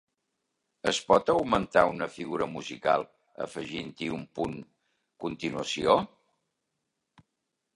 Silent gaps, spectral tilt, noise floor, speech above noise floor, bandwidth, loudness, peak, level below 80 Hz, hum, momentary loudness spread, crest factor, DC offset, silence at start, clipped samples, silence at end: none; -4.5 dB/octave; -83 dBFS; 54 dB; 11.5 kHz; -29 LUFS; -6 dBFS; -60 dBFS; none; 14 LU; 24 dB; under 0.1%; 0.85 s; under 0.1%; 1.7 s